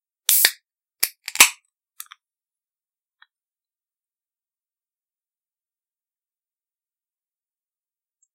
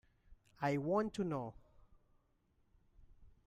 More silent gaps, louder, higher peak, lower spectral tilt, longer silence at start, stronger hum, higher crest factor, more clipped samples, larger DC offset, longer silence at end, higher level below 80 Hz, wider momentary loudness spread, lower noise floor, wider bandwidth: neither; first, -17 LUFS vs -39 LUFS; first, 0 dBFS vs -24 dBFS; second, 3.5 dB/octave vs -7.5 dB/octave; about the same, 0.3 s vs 0.3 s; neither; first, 28 dB vs 20 dB; neither; neither; first, 6.8 s vs 0.2 s; about the same, -70 dBFS vs -66 dBFS; about the same, 10 LU vs 8 LU; first, under -90 dBFS vs -76 dBFS; first, 16 kHz vs 14.5 kHz